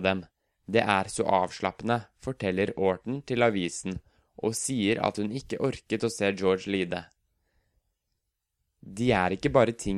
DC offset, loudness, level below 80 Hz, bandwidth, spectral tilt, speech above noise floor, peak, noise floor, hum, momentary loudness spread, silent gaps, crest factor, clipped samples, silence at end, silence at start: under 0.1%; -28 LUFS; -54 dBFS; 14 kHz; -5 dB/octave; 54 dB; -6 dBFS; -81 dBFS; none; 9 LU; none; 22 dB; under 0.1%; 0 s; 0 s